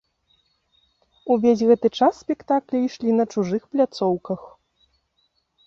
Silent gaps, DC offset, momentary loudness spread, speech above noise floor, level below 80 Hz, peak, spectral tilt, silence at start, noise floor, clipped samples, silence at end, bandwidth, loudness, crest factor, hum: none; under 0.1%; 11 LU; 49 dB; -64 dBFS; -4 dBFS; -7 dB/octave; 1.25 s; -69 dBFS; under 0.1%; 1.2 s; 7.4 kHz; -21 LUFS; 18 dB; none